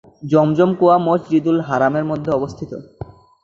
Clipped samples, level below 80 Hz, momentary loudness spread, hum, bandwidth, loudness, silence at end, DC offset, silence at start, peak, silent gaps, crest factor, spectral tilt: under 0.1%; -52 dBFS; 19 LU; none; 7.4 kHz; -17 LUFS; 0.4 s; under 0.1%; 0.2 s; -2 dBFS; none; 16 dB; -8.5 dB/octave